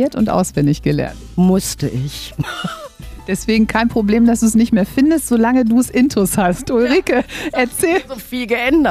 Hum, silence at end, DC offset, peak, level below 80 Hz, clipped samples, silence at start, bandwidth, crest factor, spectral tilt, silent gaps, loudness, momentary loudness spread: none; 0 s; under 0.1%; -2 dBFS; -36 dBFS; under 0.1%; 0 s; 16 kHz; 12 dB; -5.5 dB/octave; none; -16 LUFS; 11 LU